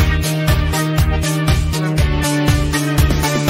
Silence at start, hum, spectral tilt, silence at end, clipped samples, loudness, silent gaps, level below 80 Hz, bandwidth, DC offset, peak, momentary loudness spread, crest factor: 0 s; none; -5 dB/octave; 0 s; under 0.1%; -16 LUFS; none; -22 dBFS; 16.5 kHz; under 0.1%; -2 dBFS; 2 LU; 12 dB